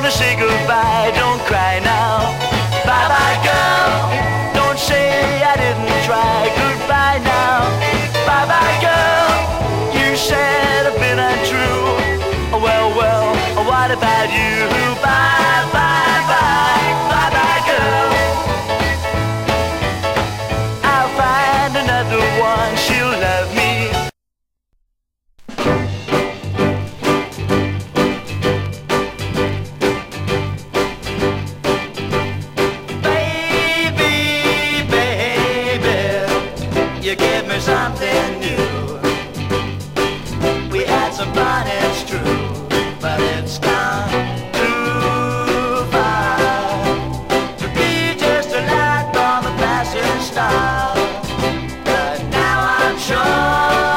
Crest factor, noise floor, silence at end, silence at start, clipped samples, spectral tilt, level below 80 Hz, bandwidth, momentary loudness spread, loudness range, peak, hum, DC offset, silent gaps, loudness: 16 dB; -75 dBFS; 0 s; 0 s; under 0.1%; -4.5 dB/octave; -34 dBFS; 16 kHz; 7 LU; 6 LU; 0 dBFS; none; under 0.1%; none; -16 LUFS